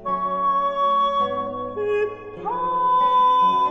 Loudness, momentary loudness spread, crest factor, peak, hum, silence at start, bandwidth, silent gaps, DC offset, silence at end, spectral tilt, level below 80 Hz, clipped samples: -21 LUFS; 11 LU; 10 dB; -10 dBFS; none; 0 s; 6.4 kHz; none; under 0.1%; 0 s; -6 dB/octave; -54 dBFS; under 0.1%